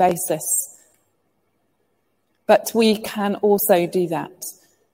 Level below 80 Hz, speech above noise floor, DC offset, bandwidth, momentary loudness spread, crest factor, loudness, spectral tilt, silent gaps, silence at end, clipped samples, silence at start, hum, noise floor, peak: -64 dBFS; 50 dB; under 0.1%; 16.5 kHz; 17 LU; 20 dB; -19 LUFS; -4 dB/octave; none; 0.4 s; under 0.1%; 0 s; none; -69 dBFS; -2 dBFS